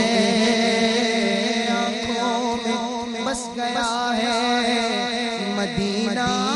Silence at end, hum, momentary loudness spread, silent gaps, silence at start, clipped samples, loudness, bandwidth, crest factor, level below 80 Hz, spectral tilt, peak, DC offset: 0 s; none; 7 LU; none; 0 s; under 0.1%; -21 LUFS; 11.5 kHz; 12 dB; -52 dBFS; -3.5 dB/octave; -8 dBFS; under 0.1%